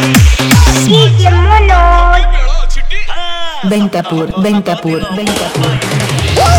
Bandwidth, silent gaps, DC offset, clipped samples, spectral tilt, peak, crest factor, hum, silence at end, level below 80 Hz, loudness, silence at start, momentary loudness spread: 19.5 kHz; none; under 0.1%; 0.2%; -5 dB/octave; 0 dBFS; 8 dB; none; 0 s; -12 dBFS; -10 LUFS; 0 s; 11 LU